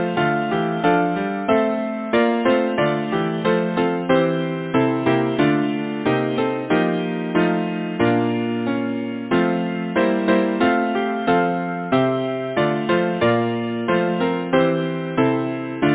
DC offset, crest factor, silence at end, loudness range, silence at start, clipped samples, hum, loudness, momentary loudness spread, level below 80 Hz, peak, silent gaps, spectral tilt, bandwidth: under 0.1%; 16 dB; 0 s; 1 LU; 0 s; under 0.1%; none; -20 LUFS; 5 LU; -54 dBFS; -2 dBFS; none; -10.5 dB/octave; 4 kHz